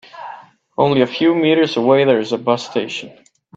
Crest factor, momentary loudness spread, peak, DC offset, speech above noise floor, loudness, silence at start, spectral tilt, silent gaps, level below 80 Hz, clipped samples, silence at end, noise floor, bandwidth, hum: 16 dB; 18 LU; 0 dBFS; under 0.1%; 22 dB; -16 LUFS; 0.15 s; -6 dB/octave; none; -60 dBFS; under 0.1%; 0.45 s; -37 dBFS; 7.8 kHz; none